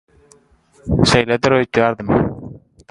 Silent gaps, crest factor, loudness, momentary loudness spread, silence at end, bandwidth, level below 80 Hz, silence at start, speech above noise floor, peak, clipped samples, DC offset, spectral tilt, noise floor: none; 18 dB; -16 LUFS; 20 LU; 0.35 s; 11.5 kHz; -36 dBFS; 0.85 s; 38 dB; 0 dBFS; under 0.1%; under 0.1%; -5.5 dB/octave; -53 dBFS